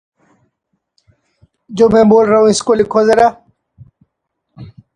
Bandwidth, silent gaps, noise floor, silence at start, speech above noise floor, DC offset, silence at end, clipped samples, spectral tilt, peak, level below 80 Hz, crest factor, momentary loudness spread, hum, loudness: 10.5 kHz; none; -72 dBFS; 1.7 s; 62 dB; under 0.1%; 0.3 s; under 0.1%; -5 dB/octave; 0 dBFS; -48 dBFS; 14 dB; 5 LU; none; -11 LUFS